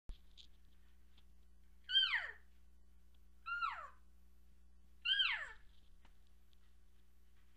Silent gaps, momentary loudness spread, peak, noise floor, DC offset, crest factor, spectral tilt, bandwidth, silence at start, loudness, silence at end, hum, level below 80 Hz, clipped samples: none; 20 LU; -22 dBFS; -69 dBFS; under 0.1%; 24 dB; -0.5 dB/octave; 15 kHz; 0.1 s; -37 LUFS; 1.85 s; none; -64 dBFS; under 0.1%